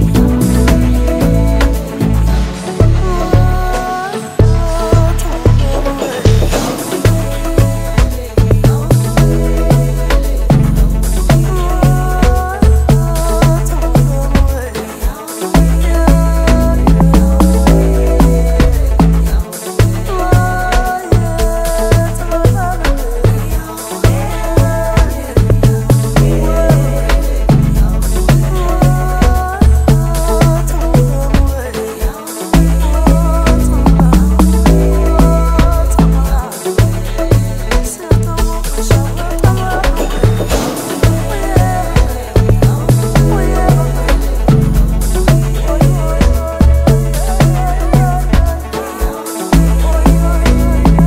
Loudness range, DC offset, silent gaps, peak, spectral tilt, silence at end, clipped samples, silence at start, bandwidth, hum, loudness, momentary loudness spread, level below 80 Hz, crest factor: 3 LU; under 0.1%; none; 0 dBFS; -6.5 dB/octave; 0 s; under 0.1%; 0 s; 16.5 kHz; none; -12 LUFS; 6 LU; -14 dBFS; 10 dB